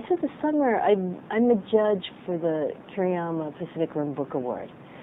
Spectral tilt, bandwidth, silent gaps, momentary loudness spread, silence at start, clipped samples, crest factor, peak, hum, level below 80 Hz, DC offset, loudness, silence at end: -10 dB/octave; 4 kHz; none; 10 LU; 0 s; under 0.1%; 18 dB; -8 dBFS; none; -66 dBFS; under 0.1%; -26 LUFS; 0 s